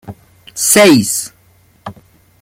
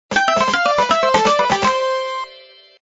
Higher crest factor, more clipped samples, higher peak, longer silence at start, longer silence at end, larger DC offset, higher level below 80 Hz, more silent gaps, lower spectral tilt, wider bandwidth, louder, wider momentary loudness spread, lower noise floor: about the same, 14 dB vs 16 dB; neither; about the same, 0 dBFS vs -2 dBFS; about the same, 0.05 s vs 0.1 s; about the same, 0.5 s vs 0.45 s; neither; about the same, -52 dBFS vs -52 dBFS; neither; about the same, -3 dB/octave vs -3 dB/octave; first, 17 kHz vs 8 kHz; first, -10 LUFS vs -16 LUFS; first, 26 LU vs 10 LU; first, -50 dBFS vs -44 dBFS